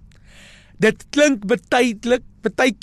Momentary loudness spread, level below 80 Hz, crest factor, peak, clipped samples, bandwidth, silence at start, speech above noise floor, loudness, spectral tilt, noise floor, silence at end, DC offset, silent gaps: 5 LU; -48 dBFS; 16 dB; -4 dBFS; under 0.1%; 13.5 kHz; 0.8 s; 27 dB; -19 LUFS; -4 dB/octave; -45 dBFS; 0.1 s; under 0.1%; none